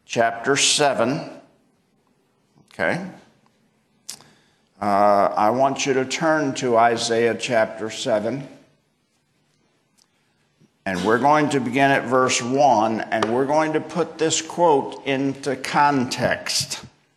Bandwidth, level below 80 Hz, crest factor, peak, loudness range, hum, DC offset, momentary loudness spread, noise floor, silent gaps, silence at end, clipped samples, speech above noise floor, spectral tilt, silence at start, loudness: 13 kHz; -64 dBFS; 18 dB; -4 dBFS; 10 LU; none; under 0.1%; 11 LU; -67 dBFS; none; 0.3 s; under 0.1%; 47 dB; -3.5 dB/octave; 0.1 s; -20 LUFS